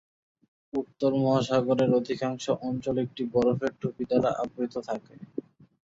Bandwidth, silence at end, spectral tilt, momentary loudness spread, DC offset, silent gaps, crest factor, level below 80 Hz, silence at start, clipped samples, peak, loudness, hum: 7.8 kHz; 0.45 s; -7 dB/octave; 12 LU; under 0.1%; none; 18 dB; -62 dBFS; 0.75 s; under 0.1%; -10 dBFS; -28 LUFS; none